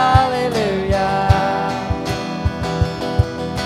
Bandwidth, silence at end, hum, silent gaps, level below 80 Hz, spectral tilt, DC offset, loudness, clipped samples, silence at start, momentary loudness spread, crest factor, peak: 14.5 kHz; 0 s; none; none; -28 dBFS; -6 dB/octave; under 0.1%; -19 LUFS; under 0.1%; 0 s; 7 LU; 18 dB; 0 dBFS